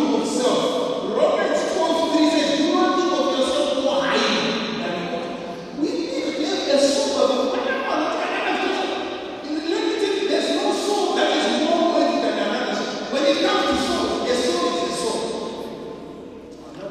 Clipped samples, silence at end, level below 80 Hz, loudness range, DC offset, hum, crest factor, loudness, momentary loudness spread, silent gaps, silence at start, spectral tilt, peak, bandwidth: under 0.1%; 0 s; -56 dBFS; 3 LU; under 0.1%; none; 16 dB; -21 LUFS; 11 LU; none; 0 s; -3 dB/octave; -6 dBFS; 14 kHz